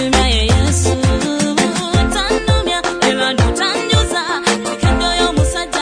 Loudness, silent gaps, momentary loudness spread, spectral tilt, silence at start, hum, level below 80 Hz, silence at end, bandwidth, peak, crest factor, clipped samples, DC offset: -15 LUFS; none; 3 LU; -4 dB/octave; 0 s; none; -22 dBFS; 0 s; 10 kHz; 0 dBFS; 14 dB; under 0.1%; under 0.1%